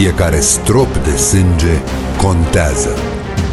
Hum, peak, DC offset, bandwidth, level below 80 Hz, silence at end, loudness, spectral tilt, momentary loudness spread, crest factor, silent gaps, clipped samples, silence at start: none; 0 dBFS; under 0.1%; 12.5 kHz; -20 dBFS; 0 s; -13 LUFS; -4.5 dB/octave; 8 LU; 12 dB; none; under 0.1%; 0 s